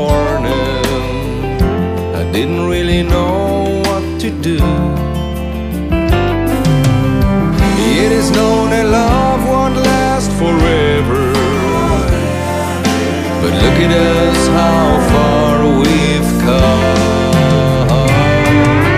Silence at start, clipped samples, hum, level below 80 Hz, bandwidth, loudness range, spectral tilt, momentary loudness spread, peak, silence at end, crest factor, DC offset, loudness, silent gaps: 0 s; under 0.1%; none; -22 dBFS; 15.5 kHz; 4 LU; -6 dB/octave; 6 LU; 0 dBFS; 0 s; 10 dB; under 0.1%; -12 LUFS; none